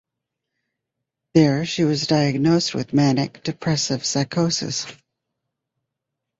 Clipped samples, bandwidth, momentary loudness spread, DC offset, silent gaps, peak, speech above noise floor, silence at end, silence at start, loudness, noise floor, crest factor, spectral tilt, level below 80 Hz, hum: under 0.1%; 8 kHz; 9 LU; under 0.1%; none; -2 dBFS; 62 dB; 1.45 s; 1.35 s; -20 LUFS; -82 dBFS; 20 dB; -5 dB/octave; -58 dBFS; none